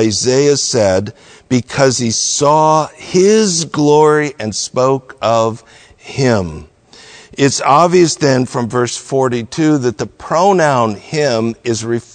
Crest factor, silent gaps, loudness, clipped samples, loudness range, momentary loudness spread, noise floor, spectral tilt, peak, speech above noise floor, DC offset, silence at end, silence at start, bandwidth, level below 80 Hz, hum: 14 dB; none; -13 LUFS; 0.1%; 3 LU; 9 LU; -40 dBFS; -4.5 dB/octave; 0 dBFS; 27 dB; under 0.1%; 0.15 s; 0 s; 9.4 kHz; -48 dBFS; none